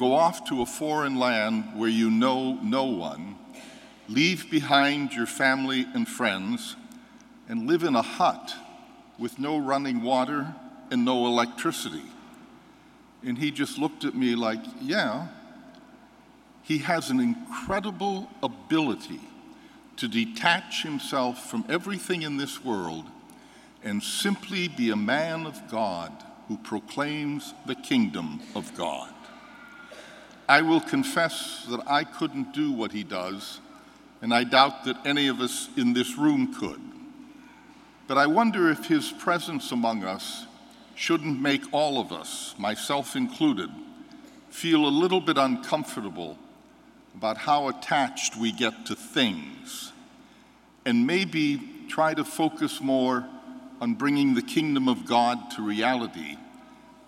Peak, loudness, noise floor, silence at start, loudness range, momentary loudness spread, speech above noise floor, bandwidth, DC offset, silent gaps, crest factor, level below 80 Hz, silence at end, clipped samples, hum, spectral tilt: -2 dBFS; -26 LUFS; -55 dBFS; 0 s; 5 LU; 17 LU; 29 dB; 16 kHz; under 0.1%; none; 26 dB; -68 dBFS; 0.3 s; under 0.1%; none; -4 dB/octave